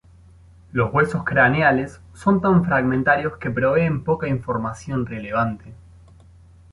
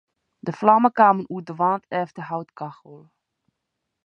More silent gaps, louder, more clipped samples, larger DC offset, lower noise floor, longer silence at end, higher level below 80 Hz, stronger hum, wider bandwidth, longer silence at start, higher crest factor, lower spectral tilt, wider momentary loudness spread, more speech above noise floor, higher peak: neither; about the same, -20 LUFS vs -20 LUFS; neither; neither; second, -48 dBFS vs -80 dBFS; about the same, 1 s vs 1.1 s; first, -46 dBFS vs -74 dBFS; neither; first, 11.5 kHz vs 6.8 kHz; first, 0.75 s vs 0.45 s; about the same, 18 dB vs 22 dB; about the same, -8 dB/octave vs -8 dB/octave; second, 10 LU vs 18 LU; second, 28 dB vs 59 dB; about the same, -2 dBFS vs -2 dBFS